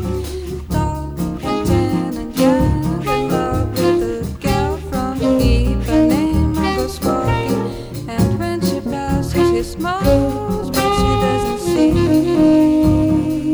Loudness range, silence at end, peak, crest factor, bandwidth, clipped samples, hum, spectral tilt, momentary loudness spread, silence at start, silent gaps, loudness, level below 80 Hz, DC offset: 4 LU; 0 s; -2 dBFS; 14 dB; over 20 kHz; under 0.1%; none; -6.5 dB/octave; 9 LU; 0 s; none; -17 LUFS; -26 dBFS; under 0.1%